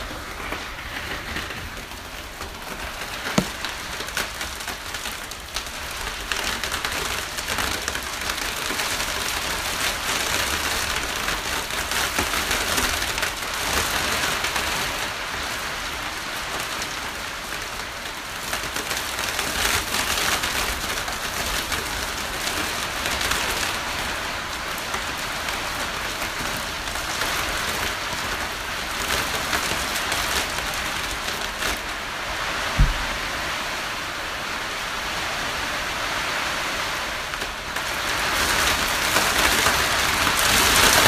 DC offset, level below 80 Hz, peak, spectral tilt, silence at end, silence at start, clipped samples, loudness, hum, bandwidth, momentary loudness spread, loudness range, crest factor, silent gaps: under 0.1%; -38 dBFS; 0 dBFS; -1.5 dB/octave; 0 s; 0 s; under 0.1%; -24 LUFS; none; 16 kHz; 10 LU; 6 LU; 24 dB; none